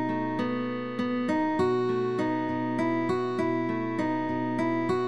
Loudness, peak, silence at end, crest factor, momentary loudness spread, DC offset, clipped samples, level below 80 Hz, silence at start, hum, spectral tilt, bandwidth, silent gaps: -28 LUFS; -14 dBFS; 0 s; 12 dB; 4 LU; 0.3%; under 0.1%; -64 dBFS; 0 s; none; -7.5 dB/octave; 11 kHz; none